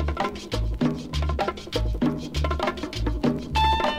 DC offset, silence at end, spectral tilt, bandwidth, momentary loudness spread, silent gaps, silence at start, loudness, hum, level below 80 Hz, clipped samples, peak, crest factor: under 0.1%; 0 s; -6 dB/octave; 15 kHz; 6 LU; none; 0 s; -26 LUFS; none; -30 dBFS; under 0.1%; -10 dBFS; 14 dB